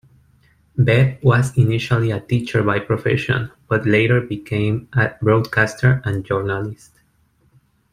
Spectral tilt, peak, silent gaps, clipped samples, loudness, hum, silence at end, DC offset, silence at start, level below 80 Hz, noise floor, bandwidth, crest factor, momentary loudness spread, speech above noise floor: -7 dB/octave; -2 dBFS; none; under 0.1%; -18 LUFS; none; 1.2 s; under 0.1%; 0.75 s; -48 dBFS; -60 dBFS; 11 kHz; 16 dB; 7 LU; 42 dB